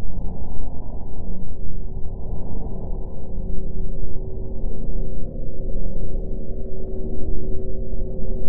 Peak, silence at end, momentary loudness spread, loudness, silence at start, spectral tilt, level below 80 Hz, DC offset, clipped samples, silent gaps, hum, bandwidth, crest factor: -4 dBFS; 0 s; 4 LU; -33 LUFS; 0 s; -14 dB/octave; -26 dBFS; under 0.1%; under 0.1%; none; none; 1.1 kHz; 10 dB